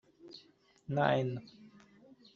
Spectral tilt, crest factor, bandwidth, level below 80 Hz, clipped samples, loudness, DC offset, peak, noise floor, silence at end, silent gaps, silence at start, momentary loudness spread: -5 dB/octave; 24 dB; 7 kHz; -74 dBFS; under 0.1%; -34 LUFS; under 0.1%; -14 dBFS; -65 dBFS; 0.65 s; none; 0.25 s; 24 LU